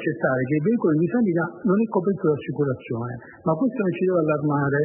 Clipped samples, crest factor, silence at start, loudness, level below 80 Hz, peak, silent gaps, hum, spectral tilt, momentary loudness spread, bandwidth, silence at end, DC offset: under 0.1%; 14 dB; 0 s; -23 LUFS; -64 dBFS; -8 dBFS; none; none; -13 dB/octave; 7 LU; 3.2 kHz; 0 s; under 0.1%